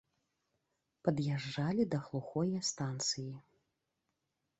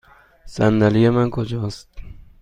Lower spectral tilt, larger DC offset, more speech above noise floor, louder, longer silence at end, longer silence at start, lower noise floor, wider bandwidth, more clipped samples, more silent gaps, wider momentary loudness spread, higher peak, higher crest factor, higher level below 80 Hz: second, -5 dB/octave vs -8 dB/octave; neither; first, 50 dB vs 25 dB; second, -36 LUFS vs -19 LUFS; first, 1.2 s vs 0.2 s; first, 1.05 s vs 0.45 s; first, -85 dBFS vs -42 dBFS; second, 8.2 kHz vs 9.8 kHz; neither; neither; second, 6 LU vs 18 LU; second, -16 dBFS vs -2 dBFS; first, 24 dB vs 18 dB; second, -72 dBFS vs -42 dBFS